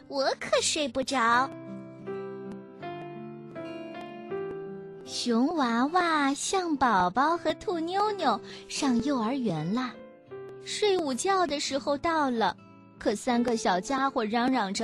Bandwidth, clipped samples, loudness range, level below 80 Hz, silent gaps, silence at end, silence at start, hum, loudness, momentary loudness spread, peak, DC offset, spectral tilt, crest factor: 12.5 kHz; under 0.1%; 7 LU; -62 dBFS; none; 0 s; 0.1 s; none; -28 LUFS; 16 LU; -12 dBFS; under 0.1%; -3.5 dB/octave; 16 dB